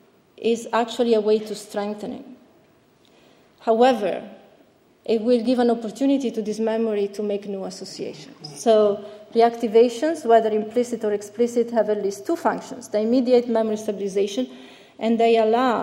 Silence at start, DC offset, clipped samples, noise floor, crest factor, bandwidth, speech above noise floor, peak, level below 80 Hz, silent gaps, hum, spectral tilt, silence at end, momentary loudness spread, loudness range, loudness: 0.4 s; under 0.1%; under 0.1%; -57 dBFS; 18 dB; 13.5 kHz; 36 dB; -4 dBFS; -70 dBFS; none; none; -5 dB/octave; 0 s; 13 LU; 5 LU; -22 LUFS